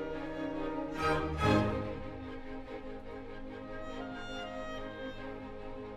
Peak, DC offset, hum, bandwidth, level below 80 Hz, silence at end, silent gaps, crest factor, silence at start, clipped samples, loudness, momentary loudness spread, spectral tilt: -16 dBFS; under 0.1%; none; 14 kHz; -48 dBFS; 0 s; none; 20 dB; 0 s; under 0.1%; -37 LUFS; 15 LU; -6.5 dB/octave